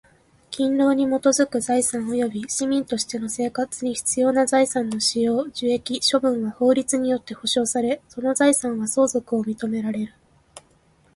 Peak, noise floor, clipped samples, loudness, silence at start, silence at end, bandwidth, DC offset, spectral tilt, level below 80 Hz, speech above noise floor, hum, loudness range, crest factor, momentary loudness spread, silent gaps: -6 dBFS; -59 dBFS; under 0.1%; -22 LUFS; 0.5 s; 0.55 s; 12 kHz; under 0.1%; -3 dB/octave; -60 dBFS; 37 dB; none; 2 LU; 18 dB; 7 LU; none